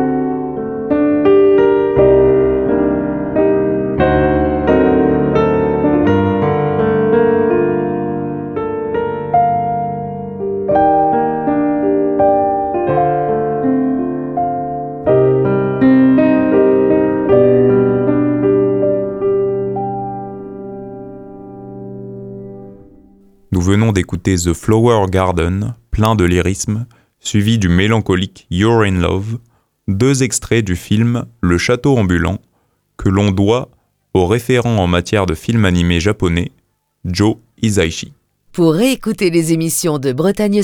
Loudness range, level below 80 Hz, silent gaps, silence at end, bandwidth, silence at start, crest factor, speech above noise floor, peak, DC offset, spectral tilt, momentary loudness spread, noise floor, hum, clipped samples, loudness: 5 LU; -34 dBFS; none; 0 s; 17.5 kHz; 0 s; 14 dB; 47 dB; 0 dBFS; under 0.1%; -6.5 dB/octave; 12 LU; -61 dBFS; none; under 0.1%; -14 LUFS